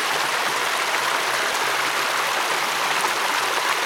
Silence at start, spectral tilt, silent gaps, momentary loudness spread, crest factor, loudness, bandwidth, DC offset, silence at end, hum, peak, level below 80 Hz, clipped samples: 0 s; 0 dB/octave; none; 1 LU; 14 dB; -21 LUFS; 18 kHz; under 0.1%; 0 s; none; -8 dBFS; -74 dBFS; under 0.1%